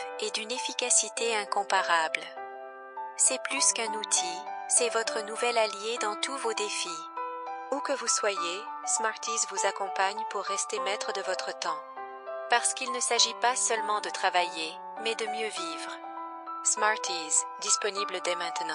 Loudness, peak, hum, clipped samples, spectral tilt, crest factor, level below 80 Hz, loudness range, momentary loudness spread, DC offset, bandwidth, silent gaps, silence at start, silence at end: -28 LUFS; -10 dBFS; none; under 0.1%; 1 dB/octave; 20 dB; under -90 dBFS; 4 LU; 13 LU; under 0.1%; 11.5 kHz; none; 0 s; 0 s